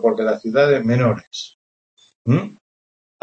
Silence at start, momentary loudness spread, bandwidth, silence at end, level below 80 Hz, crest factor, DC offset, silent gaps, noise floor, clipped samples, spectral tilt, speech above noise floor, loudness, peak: 0 s; 16 LU; 8 kHz; 0.7 s; -60 dBFS; 16 dB; under 0.1%; 1.27-1.31 s, 1.54-1.97 s, 2.15-2.25 s; under -90 dBFS; under 0.1%; -7 dB/octave; over 72 dB; -18 LUFS; -4 dBFS